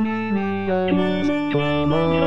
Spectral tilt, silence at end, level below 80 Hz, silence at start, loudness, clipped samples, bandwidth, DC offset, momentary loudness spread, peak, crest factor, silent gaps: -8 dB/octave; 0 s; -46 dBFS; 0 s; -21 LUFS; under 0.1%; 7.6 kHz; 1%; 3 LU; -8 dBFS; 12 dB; none